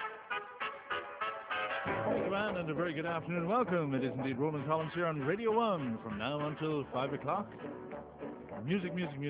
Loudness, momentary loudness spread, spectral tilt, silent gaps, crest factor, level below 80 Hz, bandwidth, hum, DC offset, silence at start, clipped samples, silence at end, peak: -36 LUFS; 11 LU; -5 dB/octave; none; 16 dB; -66 dBFS; 4 kHz; none; under 0.1%; 0 s; under 0.1%; 0 s; -18 dBFS